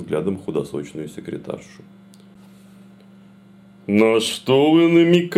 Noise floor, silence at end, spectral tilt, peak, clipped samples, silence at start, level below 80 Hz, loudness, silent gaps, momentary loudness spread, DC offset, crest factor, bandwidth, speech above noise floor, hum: -47 dBFS; 0 s; -6 dB/octave; -2 dBFS; under 0.1%; 0 s; -62 dBFS; -18 LUFS; none; 19 LU; under 0.1%; 18 dB; 13.5 kHz; 29 dB; none